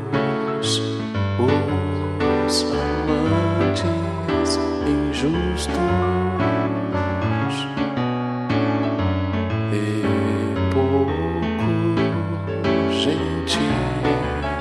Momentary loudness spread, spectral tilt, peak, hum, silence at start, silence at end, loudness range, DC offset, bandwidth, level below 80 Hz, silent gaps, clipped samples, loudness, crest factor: 4 LU; -6 dB/octave; -6 dBFS; none; 0 s; 0 s; 2 LU; under 0.1%; 12 kHz; -38 dBFS; none; under 0.1%; -21 LUFS; 14 dB